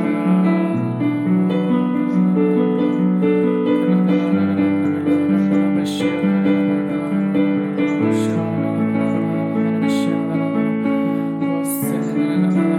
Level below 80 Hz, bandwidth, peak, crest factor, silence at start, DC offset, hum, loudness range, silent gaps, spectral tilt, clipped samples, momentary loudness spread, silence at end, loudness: -66 dBFS; 16 kHz; -6 dBFS; 12 dB; 0 s; under 0.1%; none; 2 LU; none; -7.5 dB/octave; under 0.1%; 4 LU; 0 s; -18 LUFS